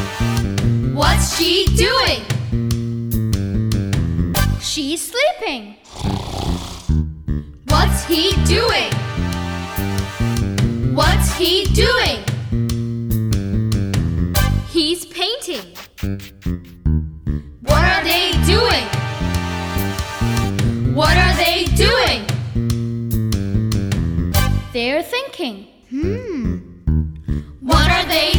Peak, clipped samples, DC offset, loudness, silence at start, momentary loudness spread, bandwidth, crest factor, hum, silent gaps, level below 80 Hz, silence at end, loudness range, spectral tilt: -2 dBFS; under 0.1%; under 0.1%; -18 LUFS; 0 s; 11 LU; over 20 kHz; 16 dB; none; none; -24 dBFS; 0 s; 4 LU; -4.5 dB/octave